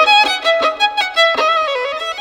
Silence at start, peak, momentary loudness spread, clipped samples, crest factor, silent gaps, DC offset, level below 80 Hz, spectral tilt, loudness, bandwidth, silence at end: 0 s; -2 dBFS; 8 LU; under 0.1%; 12 dB; none; under 0.1%; -56 dBFS; 0.5 dB/octave; -14 LUFS; 19 kHz; 0 s